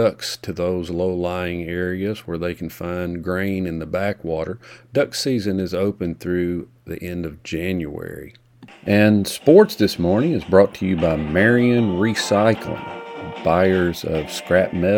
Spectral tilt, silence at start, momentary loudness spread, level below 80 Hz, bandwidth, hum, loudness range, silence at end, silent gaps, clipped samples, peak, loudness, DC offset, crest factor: -6 dB/octave; 0 s; 14 LU; -46 dBFS; 19 kHz; none; 8 LU; 0 s; none; under 0.1%; 0 dBFS; -20 LUFS; under 0.1%; 20 dB